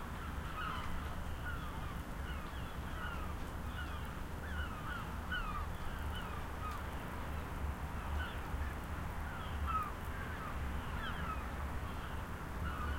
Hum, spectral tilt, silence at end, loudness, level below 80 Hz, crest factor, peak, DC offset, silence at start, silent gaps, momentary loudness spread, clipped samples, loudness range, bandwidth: none; -5.5 dB/octave; 0 s; -43 LUFS; -44 dBFS; 14 dB; -26 dBFS; under 0.1%; 0 s; none; 4 LU; under 0.1%; 2 LU; 16.5 kHz